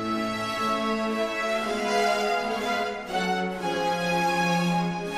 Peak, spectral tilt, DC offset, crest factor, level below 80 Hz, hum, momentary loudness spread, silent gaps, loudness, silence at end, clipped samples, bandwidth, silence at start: -12 dBFS; -4.5 dB/octave; under 0.1%; 14 dB; -56 dBFS; none; 4 LU; none; -26 LUFS; 0 s; under 0.1%; 15.5 kHz; 0 s